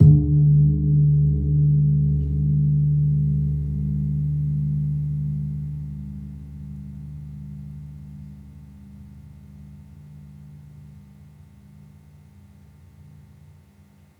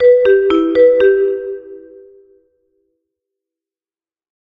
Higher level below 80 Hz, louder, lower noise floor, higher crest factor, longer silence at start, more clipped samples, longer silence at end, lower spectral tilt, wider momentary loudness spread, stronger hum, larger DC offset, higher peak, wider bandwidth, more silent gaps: first, -36 dBFS vs -52 dBFS; second, -21 LUFS vs -12 LUFS; second, -53 dBFS vs under -90 dBFS; first, 20 dB vs 14 dB; about the same, 0 s vs 0 s; neither; first, 3.2 s vs 2.75 s; first, -13 dB/octave vs -6.5 dB/octave; first, 26 LU vs 16 LU; neither; neither; about the same, -2 dBFS vs 0 dBFS; second, 0.9 kHz vs 4.9 kHz; neither